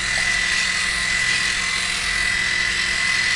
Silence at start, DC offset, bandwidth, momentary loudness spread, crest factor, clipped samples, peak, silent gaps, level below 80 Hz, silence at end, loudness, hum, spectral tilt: 0 s; under 0.1%; 11.5 kHz; 2 LU; 14 dB; under 0.1%; -8 dBFS; none; -40 dBFS; 0 s; -18 LUFS; none; 0 dB/octave